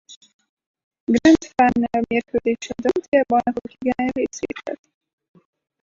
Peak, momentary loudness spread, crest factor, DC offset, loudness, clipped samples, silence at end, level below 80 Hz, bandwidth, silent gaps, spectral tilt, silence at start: -4 dBFS; 14 LU; 18 dB; under 0.1%; -20 LUFS; under 0.1%; 1.1 s; -52 dBFS; 7.6 kHz; 0.16-0.21 s, 0.33-0.39 s, 0.49-0.57 s, 0.66-0.74 s, 0.83-0.91 s, 1.00-1.07 s, 3.08-3.12 s; -5 dB/octave; 0.1 s